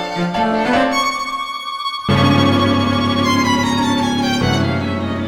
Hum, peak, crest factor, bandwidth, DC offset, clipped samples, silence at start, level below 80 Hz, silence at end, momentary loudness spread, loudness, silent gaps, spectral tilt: none; -2 dBFS; 14 dB; 16.5 kHz; under 0.1%; under 0.1%; 0 s; -42 dBFS; 0 s; 8 LU; -16 LUFS; none; -5 dB/octave